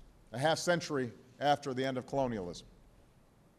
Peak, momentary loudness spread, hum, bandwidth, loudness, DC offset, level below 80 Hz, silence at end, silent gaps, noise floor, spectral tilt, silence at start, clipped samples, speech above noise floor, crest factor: -16 dBFS; 12 LU; none; 13.5 kHz; -34 LUFS; under 0.1%; -64 dBFS; 0.9 s; none; -64 dBFS; -4.5 dB/octave; 0.05 s; under 0.1%; 30 dB; 18 dB